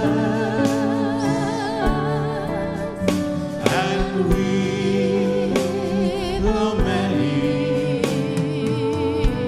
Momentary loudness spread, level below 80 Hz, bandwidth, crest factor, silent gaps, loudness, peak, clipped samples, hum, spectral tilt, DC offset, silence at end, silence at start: 4 LU; -32 dBFS; 15 kHz; 20 dB; none; -21 LUFS; 0 dBFS; under 0.1%; none; -6.5 dB/octave; under 0.1%; 0 s; 0 s